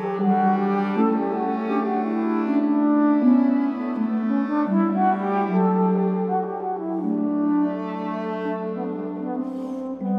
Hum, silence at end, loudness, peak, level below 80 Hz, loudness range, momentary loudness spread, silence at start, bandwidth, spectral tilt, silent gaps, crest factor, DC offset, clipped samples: none; 0 s; -22 LUFS; -8 dBFS; -70 dBFS; 5 LU; 9 LU; 0 s; 5.4 kHz; -10 dB/octave; none; 14 dB; under 0.1%; under 0.1%